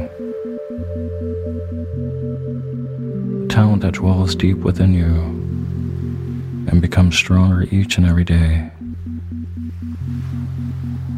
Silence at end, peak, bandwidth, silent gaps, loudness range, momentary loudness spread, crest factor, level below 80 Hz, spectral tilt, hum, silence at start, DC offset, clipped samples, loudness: 0 s; 0 dBFS; 10 kHz; none; 5 LU; 13 LU; 18 dB; -30 dBFS; -6.5 dB/octave; none; 0 s; under 0.1%; under 0.1%; -19 LUFS